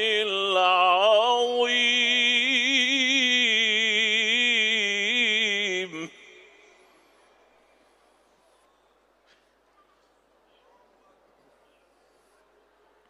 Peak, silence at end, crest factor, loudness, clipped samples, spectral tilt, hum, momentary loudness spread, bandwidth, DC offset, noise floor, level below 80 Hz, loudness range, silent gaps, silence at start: -10 dBFS; 7 s; 16 dB; -21 LUFS; under 0.1%; -0.5 dB/octave; none; 4 LU; 12.5 kHz; under 0.1%; -64 dBFS; -80 dBFS; 9 LU; none; 0 s